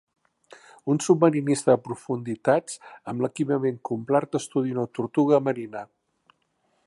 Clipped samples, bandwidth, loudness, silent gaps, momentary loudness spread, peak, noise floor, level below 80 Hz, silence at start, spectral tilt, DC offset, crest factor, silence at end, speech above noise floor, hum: under 0.1%; 11.5 kHz; -24 LUFS; none; 14 LU; -4 dBFS; -71 dBFS; -72 dBFS; 0.85 s; -6.5 dB/octave; under 0.1%; 20 dB; 1 s; 47 dB; none